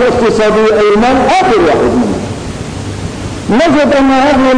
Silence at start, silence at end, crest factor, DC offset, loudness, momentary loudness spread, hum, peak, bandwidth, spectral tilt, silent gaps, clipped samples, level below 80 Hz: 0 s; 0 s; 6 dB; under 0.1%; -9 LUFS; 12 LU; none; -4 dBFS; 10.5 kHz; -5.5 dB/octave; none; under 0.1%; -30 dBFS